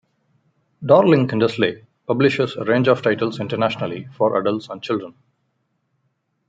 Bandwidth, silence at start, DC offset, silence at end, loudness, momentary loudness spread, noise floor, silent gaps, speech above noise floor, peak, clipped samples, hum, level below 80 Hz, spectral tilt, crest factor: 7.8 kHz; 0.8 s; under 0.1%; 1.4 s; -19 LUFS; 12 LU; -70 dBFS; none; 52 dB; -2 dBFS; under 0.1%; none; -64 dBFS; -7.5 dB/octave; 18 dB